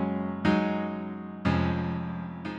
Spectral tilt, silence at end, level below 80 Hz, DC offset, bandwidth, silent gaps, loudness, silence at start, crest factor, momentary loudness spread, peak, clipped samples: -8 dB/octave; 0 s; -50 dBFS; under 0.1%; 7.6 kHz; none; -29 LUFS; 0 s; 16 dB; 10 LU; -12 dBFS; under 0.1%